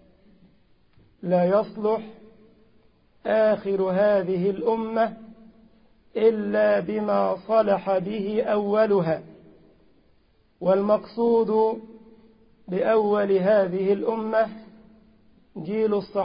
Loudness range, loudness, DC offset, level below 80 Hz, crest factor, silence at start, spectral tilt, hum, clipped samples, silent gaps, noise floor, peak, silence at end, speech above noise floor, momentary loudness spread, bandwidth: 3 LU; -23 LUFS; under 0.1%; -64 dBFS; 16 dB; 1.2 s; -11.5 dB/octave; none; under 0.1%; none; -61 dBFS; -8 dBFS; 0 s; 39 dB; 10 LU; 5.2 kHz